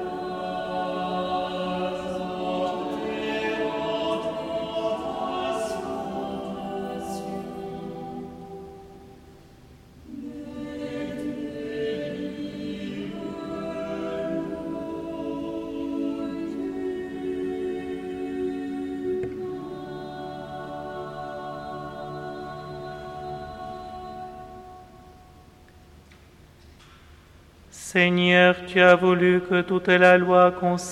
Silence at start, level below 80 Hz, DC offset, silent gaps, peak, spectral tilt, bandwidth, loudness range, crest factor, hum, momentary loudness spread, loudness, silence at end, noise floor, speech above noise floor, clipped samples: 0 s; -54 dBFS; under 0.1%; none; -2 dBFS; -5.5 dB/octave; 13.5 kHz; 18 LU; 24 dB; none; 19 LU; -26 LUFS; 0 s; -51 dBFS; 33 dB; under 0.1%